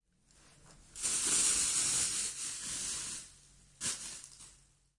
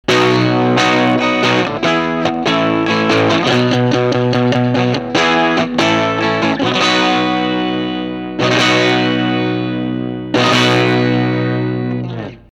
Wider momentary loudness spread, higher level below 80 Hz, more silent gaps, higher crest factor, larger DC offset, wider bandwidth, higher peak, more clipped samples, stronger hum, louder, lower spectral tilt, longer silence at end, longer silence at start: first, 19 LU vs 7 LU; second, -64 dBFS vs -46 dBFS; neither; first, 20 dB vs 14 dB; neither; about the same, 11.5 kHz vs 11.5 kHz; second, -18 dBFS vs 0 dBFS; neither; neither; second, -32 LUFS vs -14 LUFS; second, 1 dB/octave vs -5.5 dB/octave; first, 0.45 s vs 0.15 s; first, 0.65 s vs 0.1 s